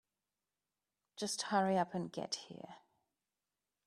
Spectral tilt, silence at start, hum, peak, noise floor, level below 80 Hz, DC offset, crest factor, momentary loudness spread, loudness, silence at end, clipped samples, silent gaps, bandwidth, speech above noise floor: -4 dB/octave; 1.15 s; 50 Hz at -70 dBFS; -20 dBFS; under -90 dBFS; -84 dBFS; under 0.1%; 22 dB; 20 LU; -38 LUFS; 1.1 s; under 0.1%; none; 14 kHz; over 52 dB